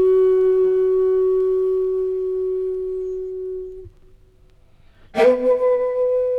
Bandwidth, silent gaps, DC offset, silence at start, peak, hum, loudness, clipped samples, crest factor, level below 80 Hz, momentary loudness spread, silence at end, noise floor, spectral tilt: 5.6 kHz; none; under 0.1%; 0 s; -4 dBFS; none; -19 LUFS; under 0.1%; 14 dB; -48 dBFS; 13 LU; 0 s; -51 dBFS; -7 dB/octave